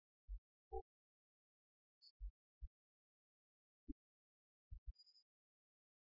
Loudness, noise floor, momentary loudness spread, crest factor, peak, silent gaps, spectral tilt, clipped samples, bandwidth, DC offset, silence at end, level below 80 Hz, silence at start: -60 LUFS; under -90 dBFS; 10 LU; 24 dB; -36 dBFS; 0.38-0.71 s, 0.82-2.01 s, 2.10-2.20 s, 2.30-2.61 s, 2.67-4.71 s, 4.78-4.86 s; -7.5 dB/octave; under 0.1%; 5.4 kHz; under 0.1%; 0.85 s; -62 dBFS; 0.3 s